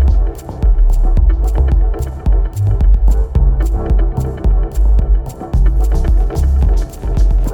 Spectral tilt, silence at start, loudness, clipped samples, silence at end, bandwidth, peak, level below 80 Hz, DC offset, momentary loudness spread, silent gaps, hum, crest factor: -8 dB/octave; 0 s; -16 LUFS; under 0.1%; 0 s; 8 kHz; 0 dBFS; -12 dBFS; under 0.1%; 5 LU; none; none; 10 dB